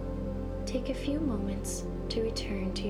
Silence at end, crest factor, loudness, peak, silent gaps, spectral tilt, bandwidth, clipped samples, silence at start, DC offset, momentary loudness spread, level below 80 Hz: 0 s; 14 dB; -34 LUFS; -18 dBFS; none; -5.5 dB/octave; 14 kHz; under 0.1%; 0 s; under 0.1%; 5 LU; -40 dBFS